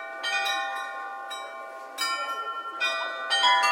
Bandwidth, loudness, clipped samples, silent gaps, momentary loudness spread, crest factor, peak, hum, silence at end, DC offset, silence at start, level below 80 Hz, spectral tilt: 16.5 kHz; -27 LUFS; under 0.1%; none; 14 LU; 20 dB; -10 dBFS; none; 0 s; under 0.1%; 0 s; under -90 dBFS; 3.5 dB/octave